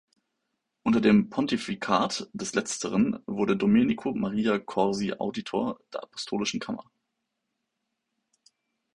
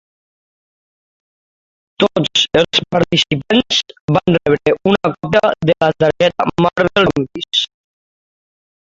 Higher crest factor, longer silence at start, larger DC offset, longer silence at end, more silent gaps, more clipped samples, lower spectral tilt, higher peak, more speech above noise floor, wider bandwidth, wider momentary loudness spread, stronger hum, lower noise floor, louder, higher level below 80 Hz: first, 22 dB vs 16 dB; second, 0.85 s vs 2 s; neither; first, 2.15 s vs 1.15 s; second, none vs 4.01-4.08 s; neither; about the same, -5 dB/octave vs -5 dB/octave; second, -6 dBFS vs 0 dBFS; second, 55 dB vs over 75 dB; first, 11 kHz vs 7.8 kHz; first, 11 LU vs 4 LU; neither; second, -82 dBFS vs under -90 dBFS; second, -27 LUFS vs -15 LUFS; second, -62 dBFS vs -46 dBFS